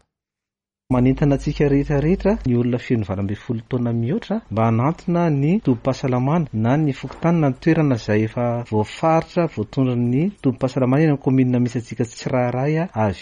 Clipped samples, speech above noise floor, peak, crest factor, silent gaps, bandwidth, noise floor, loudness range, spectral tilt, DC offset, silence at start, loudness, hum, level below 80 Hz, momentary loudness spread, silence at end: under 0.1%; 69 dB; -6 dBFS; 14 dB; none; 9.6 kHz; -88 dBFS; 2 LU; -8.5 dB/octave; under 0.1%; 0.9 s; -20 LUFS; none; -40 dBFS; 6 LU; 0 s